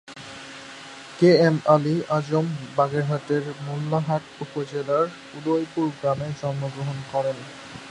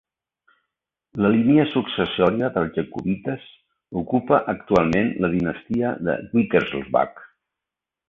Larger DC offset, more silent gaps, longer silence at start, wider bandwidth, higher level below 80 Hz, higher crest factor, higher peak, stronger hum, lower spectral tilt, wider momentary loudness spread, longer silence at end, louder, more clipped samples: neither; neither; second, 0.1 s vs 1.15 s; first, 11 kHz vs 7.2 kHz; second, -64 dBFS vs -50 dBFS; about the same, 20 dB vs 20 dB; about the same, -4 dBFS vs -2 dBFS; neither; about the same, -7 dB/octave vs -8 dB/octave; first, 20 LU vs 9 LU; second, 0 s vs 0.85 s; about the same, -24 LUFS vs -22 LUFS; neither